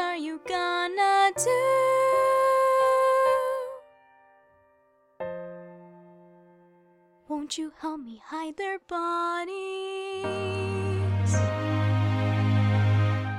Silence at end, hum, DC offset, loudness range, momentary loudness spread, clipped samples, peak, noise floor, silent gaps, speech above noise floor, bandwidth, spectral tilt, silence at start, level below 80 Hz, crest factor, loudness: 0 s; none; under 0.1%; 17 LU; 15 LU; under 0.1%; -12 dBFS; -64 dBFS; none; 34 dB; 13.5 kHz; -5.5 dB/octave; 0 s; -64 dBFS; 14 dB; -26 LUFS